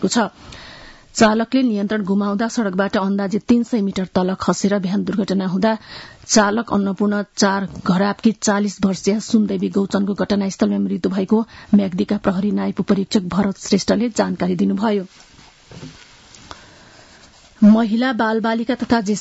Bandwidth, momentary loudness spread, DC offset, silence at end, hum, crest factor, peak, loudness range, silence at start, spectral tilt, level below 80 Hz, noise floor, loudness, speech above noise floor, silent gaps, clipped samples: 8 kHz; 8 LU; under 0.1%; 0 s; none; 16 dB; -2 dBFS; 3 LU; 0 s; -5.5 dB/octave; -50 dBFS; -47 dBFS; -18 LUFS; 29 dB; none; under 0.1%